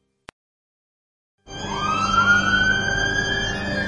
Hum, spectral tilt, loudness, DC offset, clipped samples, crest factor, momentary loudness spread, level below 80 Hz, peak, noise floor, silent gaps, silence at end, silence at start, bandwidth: none; -3 dB/octave; -19 LUFS; under 0.1%; under 0.1%; 16 dB; 13 LU; -40 dBFS; -6 dBFS; under -90 dBFS; none; 0 s; 1.45 s; 10.5 kHz